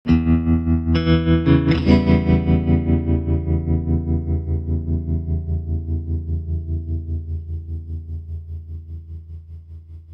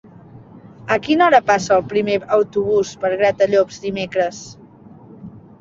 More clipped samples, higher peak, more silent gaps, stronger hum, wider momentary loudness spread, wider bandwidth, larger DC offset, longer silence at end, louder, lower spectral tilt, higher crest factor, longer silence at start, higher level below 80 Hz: neither; about the same, -2 dBFS vs -2 dBFS; neither; neither; first, 19 LU vs 11 LU; second, 5.6 kHz vs 7.8 kHz; neither; second, 0 s vs 0.2 s; second, -20 LUFS vs -17 LUFS; first, -10 dB/octave vs -5 dB/octave; about the same, 18 dB vs 16 dB; second, 0.05 s vs 0.35 s; first, -26 dBFS vs -56 dBFS